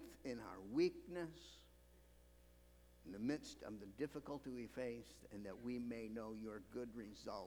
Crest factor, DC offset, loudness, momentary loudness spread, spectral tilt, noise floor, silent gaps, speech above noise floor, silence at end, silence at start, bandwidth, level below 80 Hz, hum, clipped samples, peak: 22 dB; under 0.1%; -48 LUFS; 15 LU; -6 dB/octave; -68 dBFS; none; 20 dB; 0 s; 0 s; over 20 kHz; -70 dBFS; 60 Hz at -70 dBFS; under 0.1%; -28 dBFS